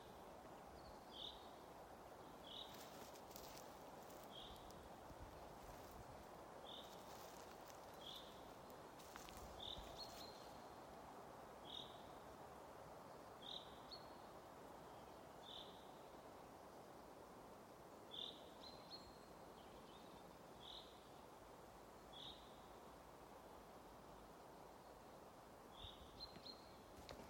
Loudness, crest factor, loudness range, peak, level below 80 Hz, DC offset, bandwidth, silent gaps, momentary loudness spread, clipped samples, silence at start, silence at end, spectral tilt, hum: -58 LUFS; 24 dB; 4 LU; -36 dBFS; -72 dBFS; under 0.1%; 16.5 kHz; none; 7 LU; under 0.1%; 0 s; 0 s; -3.5 dB/octave; none